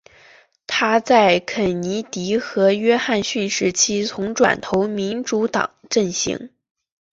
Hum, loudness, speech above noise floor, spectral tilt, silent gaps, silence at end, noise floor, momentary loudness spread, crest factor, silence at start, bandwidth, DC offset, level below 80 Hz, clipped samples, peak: none; -19 LUFS; 32 dB; -3.5 dB/octave; none; 0.75 s; -51 dBFS; 9 LU; 18 dB; 0.7 s; 8 kHz; under 0.1%; -56 dBFS; under 0.1%; -2 dBFS